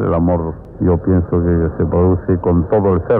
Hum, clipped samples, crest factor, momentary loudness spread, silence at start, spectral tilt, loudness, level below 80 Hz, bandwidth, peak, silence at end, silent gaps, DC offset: none; under 0.1%; 10 dB; 4 LU; 0 s; -13.5 dB/octave; -15 LUFS; -30 dBFS; 3 kHz; -4 dBFS; 0 s; none; under 0.1%